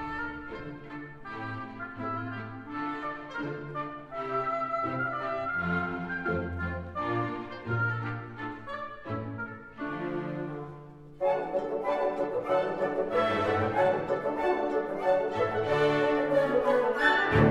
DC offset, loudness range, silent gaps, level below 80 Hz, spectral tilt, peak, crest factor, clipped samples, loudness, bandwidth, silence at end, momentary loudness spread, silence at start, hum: under 0.1%; 9 LU; none; -54 dBFS; -7.5 dB/octave; -10 dBFS; 20 dB; under 0.1%; -30 LUFS; 11.5 kHz; 0 s; 13 LU; 0 s; none